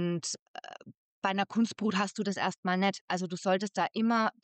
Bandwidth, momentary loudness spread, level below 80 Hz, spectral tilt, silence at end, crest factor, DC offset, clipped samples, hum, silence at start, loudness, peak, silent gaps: 9 kHz; 13 LU; -82 dBFS; -4.5 dB/octave; 0.15 s; 16 dB; under 0.1%; under 0.1%; none; 0 s; -31 LUFS; -16 dBFS; 0.39-0.54 s, 0.97-1.22 s, 2.58-2.63 s, 3.01-3.08 s